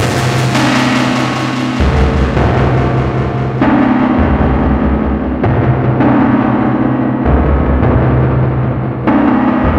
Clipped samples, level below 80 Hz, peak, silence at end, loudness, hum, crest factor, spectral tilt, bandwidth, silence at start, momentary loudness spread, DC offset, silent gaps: under 0.1%; -20 dBFS; 0 dBFS; 0 s; -12 LUFS; none; 10 dB; -7 dB/octave; 12 kHz; 0 s; 4 LU; under 0.1%; none